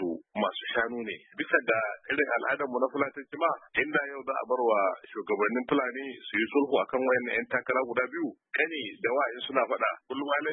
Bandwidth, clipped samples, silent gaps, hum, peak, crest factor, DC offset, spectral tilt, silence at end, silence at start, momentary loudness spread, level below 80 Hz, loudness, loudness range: 4 kHz; under 0.1%; none; none; -10 dBFS; 20 dB; under 0.1%; -8 dB/octave; 0 s; 0 s; 7 LU; -72 dBFS; -29 LUFS; 1 LU